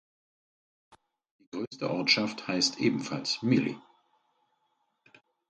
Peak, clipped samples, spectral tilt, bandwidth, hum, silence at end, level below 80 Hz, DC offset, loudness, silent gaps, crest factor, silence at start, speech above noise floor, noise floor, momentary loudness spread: -10 dBFS; under 0.1%; -4 dB/octave; 9.2 kHz; none; 1.7 s; -74 dBFS; under 0.1%; -28 LUFS; 1.67-1.71 s; 22 dB; 1.55 s; 47 dB; -76 dBFS; 14 LU